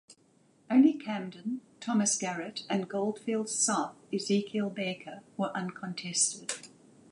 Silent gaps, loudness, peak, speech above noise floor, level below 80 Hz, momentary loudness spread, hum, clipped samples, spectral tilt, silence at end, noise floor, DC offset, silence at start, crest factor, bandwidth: none; -31 LUFS; -12 dBFS; 35 dB; -82 dBFS; 12 LU; none; under 0.1%; -3.5 dB/octave; 0.45 s; -65 dBFS; under 0.1%; 0.1 s; 20 dB; 11.5 kHz